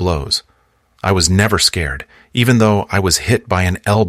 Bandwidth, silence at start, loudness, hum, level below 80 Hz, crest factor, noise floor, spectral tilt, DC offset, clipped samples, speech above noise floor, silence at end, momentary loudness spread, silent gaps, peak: 16 kHz; 0 s; -15 LUFS; none; -34 dBFS; 16 dB; -57 dBFS; -4 dB/octave; under 0.1%; under 0.1%; 42 dB; 0 s; 10 LU; none; 0 dBFS